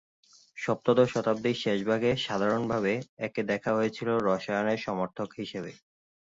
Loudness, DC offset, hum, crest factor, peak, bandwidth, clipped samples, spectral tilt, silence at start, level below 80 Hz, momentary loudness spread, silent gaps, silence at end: -29 LUFS; under 0.1%; none; 18 dB; -10 dBFS; 7.8 kHz; under 0.1%; -6 dB/octave; 0.55 s; -64 dBFS; 11 LU; 3.09-3.17 s; 0.65 s